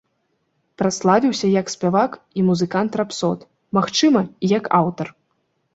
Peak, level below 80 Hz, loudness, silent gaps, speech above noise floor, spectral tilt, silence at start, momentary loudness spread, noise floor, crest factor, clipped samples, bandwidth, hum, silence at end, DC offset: -2 dBFS; -60 dBFS; -19 LUFS; none; 51 dB; -5.5 dB/octave; 0.8 s; 7 LU; -69 dBFS; 18 dB; under 0.1%; 8 kHz; none; 0.65 s; under 0.1%